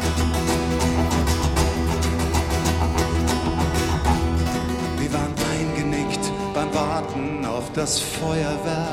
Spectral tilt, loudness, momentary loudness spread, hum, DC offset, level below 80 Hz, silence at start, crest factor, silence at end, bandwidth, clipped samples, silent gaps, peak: -5 dB/octave; -23 LUFS; 4 LU; none; under 0.1%; -28 dBFS; 0 s; 14 dB; 0 s; 16.5 kHz; under 0.1%; none; -6 dBFS